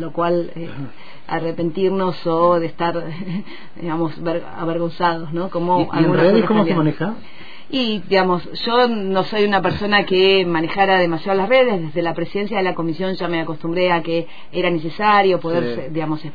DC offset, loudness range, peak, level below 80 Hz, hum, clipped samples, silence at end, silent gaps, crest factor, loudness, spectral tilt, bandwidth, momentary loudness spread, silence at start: 4%; 5 LU; -4 dBFS; -52 dBFS; none; under 0.1%; 0.05 s; none; 16 dB; -18 LUFS; -8 dB/octave; 5 kHz; 12 LU; 0 s